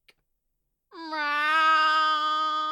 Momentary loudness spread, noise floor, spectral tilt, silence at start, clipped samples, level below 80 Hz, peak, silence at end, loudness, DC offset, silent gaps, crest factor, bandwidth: 12 LU; -78 dBFS; 1.5 dB/octave; 0.95 s; under 0.1%; -80 dBFS; -12 dBFS; 0 s; -23 LUFS; under 0.1%; none; 14 dB; 13 kHz